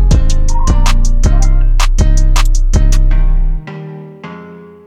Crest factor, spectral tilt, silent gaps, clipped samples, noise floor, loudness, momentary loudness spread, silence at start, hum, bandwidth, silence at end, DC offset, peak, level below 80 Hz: 8 dB; -5 dB/octave; none; under 0.1%; -32 dBFS; -14 LUFS; 16 LU; 0 s; none; 9.4 kHz; 0.3 s; under 0.1%; 0 dBFS; -8 dBFS